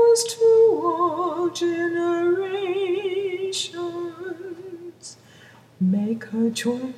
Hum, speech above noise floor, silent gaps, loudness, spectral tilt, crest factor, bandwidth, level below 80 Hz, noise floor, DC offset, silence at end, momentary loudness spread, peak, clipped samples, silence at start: none; 26 dB; none; -22 LUFS; -4.5 dB/octave; 14 dB; 14.5 kHz; -74 dBFS; -49 dBFS; under 0.1%; 0 s; 18 LU; -8 dBFS; under 0.1%; 0 s